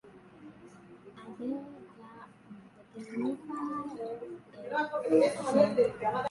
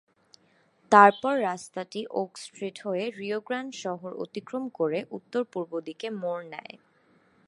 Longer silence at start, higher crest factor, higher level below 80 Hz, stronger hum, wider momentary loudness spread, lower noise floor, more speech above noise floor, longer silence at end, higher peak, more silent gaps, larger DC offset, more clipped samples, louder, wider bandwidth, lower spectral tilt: second, 0.05 s vs 0.9 s; about the same, 22 dB vs 26 dB; first, -72 dBFS vs -82 dBFS; neither; first, 26 LU vs 17 LU; second, -53 dBFS vs -65 dBFS; second, 23 dB vs 38 dB; second, 0 s vs 0.7 s; second, -10 dBFS vs -2 dBFS; neither; neither; neither; second, -31 LUFS vs -27 LUFS; about the same, 11.5 kHz vs 11.5 kHz; about the same, -6 dB/octave vs -5 dB/octave